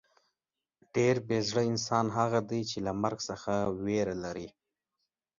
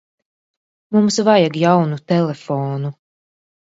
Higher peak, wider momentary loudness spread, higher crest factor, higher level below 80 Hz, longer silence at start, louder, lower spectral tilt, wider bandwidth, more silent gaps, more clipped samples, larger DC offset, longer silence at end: second, -12 dBFS vs 0 dBFS; about the same, 9 LU vs 10 LU; about the same, 20 dB vs 18 dB; about the same, -62 dBFS vs -64 dBFS; about the same, 0.95 s vs 0.9 s; second, -31 LUFS vs -17 LUFS; about the same, -5.5 dB/octave vs -6 dB/octave; about the same, 7.6 kHz vs 8 kHz; neither; neither; neither; about the same, 0.9 s vs 0.85 s